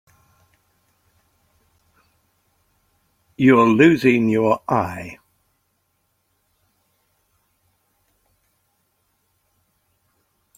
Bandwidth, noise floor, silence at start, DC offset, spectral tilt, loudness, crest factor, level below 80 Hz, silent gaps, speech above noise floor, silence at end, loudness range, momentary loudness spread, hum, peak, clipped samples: 15 kHz; -69 dBFS; 3.4 s; under 0.1%; -7 dB/octave; -16 LUFS; 22 dB; -62 dBFS; none; 54 dB; 5.45 s; 9 LU; 15 LU; none; -2 dBFS; under 0.1%